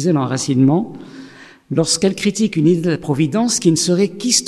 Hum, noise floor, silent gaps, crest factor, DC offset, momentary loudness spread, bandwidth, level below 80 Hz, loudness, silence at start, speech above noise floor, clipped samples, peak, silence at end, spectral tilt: none; -39 dBFS; none; 16 dB; under 0.1%; 6 LU; 14 kHz; -56 dBFS; -16 LUFS; 0 s; 23 dB; under 0.1%; 0 dBFS; 0 s; -4.5 dB/octave